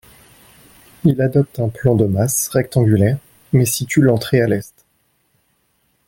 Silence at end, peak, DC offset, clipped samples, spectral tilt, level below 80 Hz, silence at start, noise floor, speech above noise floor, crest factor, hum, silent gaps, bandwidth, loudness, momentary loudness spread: 1.4 s; -2 dBFS; under 0.1%; under 0.1%; -6 dB/octave; -48 dBFS; 1.05 s; -63 dBFS; 48 dB; 16 dB; none; none; 17 kHz; -17 LUFS; 5 LU